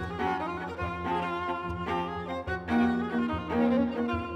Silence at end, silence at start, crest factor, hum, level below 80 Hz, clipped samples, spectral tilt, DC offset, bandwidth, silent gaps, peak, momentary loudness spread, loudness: 0 s; 0 s; 16 dB; none; -52 dBFS; under 0.1%; -7.5 dB/octave; under 0.1%; 8.4 kHz; none; -14 dBFS; 8 LU; -30 LUFS